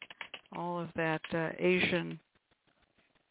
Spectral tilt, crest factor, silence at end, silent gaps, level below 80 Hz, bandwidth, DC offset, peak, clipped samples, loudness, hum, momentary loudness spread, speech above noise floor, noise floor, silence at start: -4 dB/octave; 20 dB; 1.15 s; none; -68 dBFS; 4 kHz; under 0.1%; -16 dBFS; under 0.1%; -33 LUFS; none; 16 LU; 40 dB; -73 dBFS; 0 s